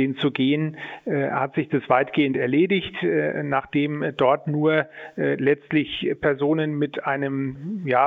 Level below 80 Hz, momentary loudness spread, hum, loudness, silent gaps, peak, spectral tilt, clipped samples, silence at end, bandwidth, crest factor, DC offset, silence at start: -60 dBFS; 6 LU; none; -23 LUFS; none; -4 dBFS; -9 dB/octave; under 0.1%; 0 s; 4.3 kHz; 18 dB; under 0.1%; 0 s